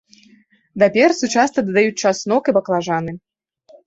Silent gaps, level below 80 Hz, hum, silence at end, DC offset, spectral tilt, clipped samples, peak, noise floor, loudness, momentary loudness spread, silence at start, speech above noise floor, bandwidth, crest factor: none; -60 dBFS; none; 0.7 s; under 0.1%; -4.5 dB/octave; under 0.1%; -2 dBFS; -53 dBFS; -17 LUFS; 11 LU; 0.75 s; 37 dB; 8.2 kHz; 16 dB